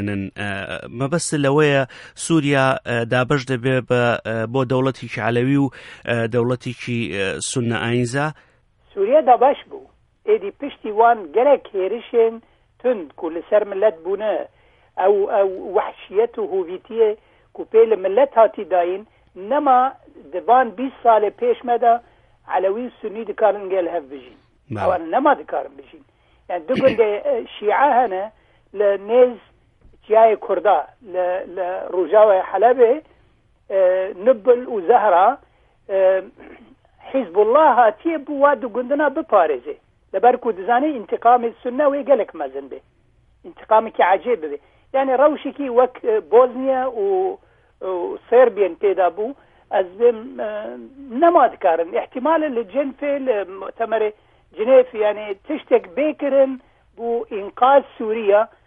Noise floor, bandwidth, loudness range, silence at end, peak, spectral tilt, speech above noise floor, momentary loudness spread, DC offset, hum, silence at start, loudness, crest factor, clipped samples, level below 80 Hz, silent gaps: -57 dBFS; 11.5 kHz; 4 LU; 0.2 s; -2 dBFS; -6 dB/octave; 39 dB; 13 LU; under 0.1%; none; 0 s; -19 LUFS; 18 dB; under 0.1%; -58 dBFS; none